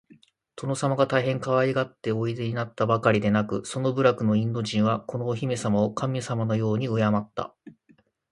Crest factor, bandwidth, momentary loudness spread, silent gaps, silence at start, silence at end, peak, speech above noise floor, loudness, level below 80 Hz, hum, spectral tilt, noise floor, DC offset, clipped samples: 20 dB; 11.5 kHz; 7 LU; none; 0.55 s; 0.6 s; -6 dBFS; 37 dB; -25 LUFS; -60 dBFS; none; -6.5 dB/octave; -62 dBFS; under 0.1%; under 0.1%